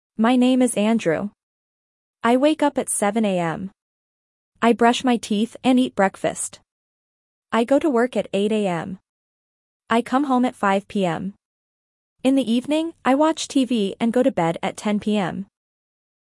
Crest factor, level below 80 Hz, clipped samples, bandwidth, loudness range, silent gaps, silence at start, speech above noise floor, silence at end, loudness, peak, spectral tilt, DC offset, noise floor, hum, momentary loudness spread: 18 dB; -64 dBFS; under 0.1%; 12 kHz; 3 LU; 1.43-2.14 s, 3.82-4.52 s, 6.71-7.43 s, 9.09-9.80 s, 11.45-12.16 s; 0.2 s; over 70 dB; 0.85 s; -21 LUFS; -4 dBFS; -5 dB/octave; under 0.1%; under -90 dBFS; none; 10 LU